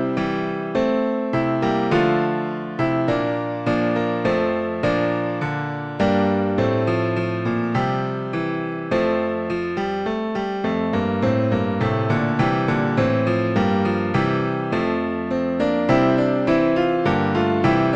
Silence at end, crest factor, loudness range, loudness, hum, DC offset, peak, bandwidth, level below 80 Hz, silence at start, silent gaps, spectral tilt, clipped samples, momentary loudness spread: 0 s; 14 dB; 3 LU; -21 LUFS; none; under 0.1%; -6 dBFS; 8.2 kHz; -48 dBFS; 0 s; none; -8 dB/octave; under 0.1%; 6 LU